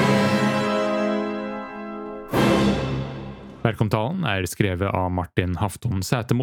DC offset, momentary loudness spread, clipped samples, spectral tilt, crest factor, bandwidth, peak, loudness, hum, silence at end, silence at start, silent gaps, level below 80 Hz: under 0.1%; 14 LU; under 0.1%; -6 dB/octave; 22 dB; 19 kHz; -2 dBFS; -23 LUFS; none; 0 s; 0 s; none; -46 dBFS